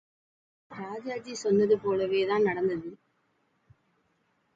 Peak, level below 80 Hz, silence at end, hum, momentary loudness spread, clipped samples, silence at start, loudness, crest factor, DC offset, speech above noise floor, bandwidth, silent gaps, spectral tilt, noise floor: -14 dBFS; -70 dBFS; 1.6 s; none; 17 LU; under 0.1%; 0.7 s; -28 LUFS; 18 dB; under 0.1%; 45 dB; 7.8 kHz; none; -5.5 dB/octave; -72 dBFS